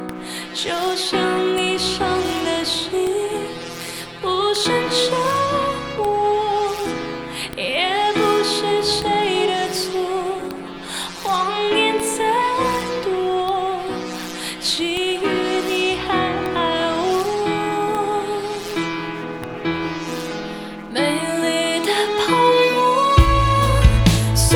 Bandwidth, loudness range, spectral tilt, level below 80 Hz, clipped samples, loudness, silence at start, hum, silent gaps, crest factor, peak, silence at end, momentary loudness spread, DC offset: over 20 kHz; 5 LU; -4.5 dB/octave; -30 dBFS; under 0.1%; -20 LUFS; 0 s; none; none; 20 dB; 0 dBFS; 0 s; 12 LU; under 0.1%